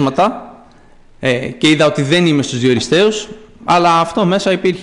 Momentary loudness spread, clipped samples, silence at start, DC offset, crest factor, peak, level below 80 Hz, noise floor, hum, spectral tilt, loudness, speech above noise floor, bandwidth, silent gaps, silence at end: 10 LU; under 0.1%; 0 s; under 0.1%; 12 dB; -2 dBFS; -48 dBFS; -43 dBFS; none; -5 dB/octave; -13 LUFS; 29 dB; 11 kHz; none; 0 s